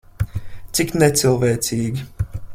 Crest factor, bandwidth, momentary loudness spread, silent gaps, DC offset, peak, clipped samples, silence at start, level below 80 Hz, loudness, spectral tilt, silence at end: 18 dB; 16.5 kHz; 13 LU; none; under 0.1%; -2 dBFS; under 0.1%; 0.2 s; -36 dBFS; -20 LUFS; -4.5 dB/octave; 0 s